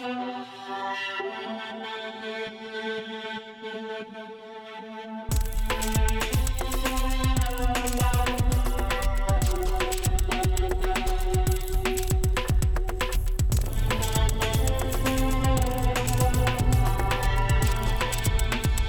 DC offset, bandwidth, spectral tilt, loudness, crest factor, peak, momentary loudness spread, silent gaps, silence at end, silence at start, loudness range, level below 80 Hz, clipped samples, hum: under 0.1%; over 20 kHz; -4.5 dB/octave; -27 LUFS; 14 dB; -10 dBFS; 10 LU; none; 0 s; 0 s; 9 LU; -28 dBFS; under 0.1%; none